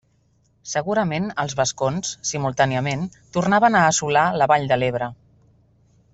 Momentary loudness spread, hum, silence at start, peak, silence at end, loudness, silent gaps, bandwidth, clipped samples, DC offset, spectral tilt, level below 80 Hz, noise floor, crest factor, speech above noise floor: 11 LU; none; 0.65 s; -4 dBFS; 1 s; -21 LUFS; none; 8.4 kHz; under 0.1%; under 0.1%; -4 dB/octave; -54 dBFS; -62 dBFS; 18 dB; 42 dB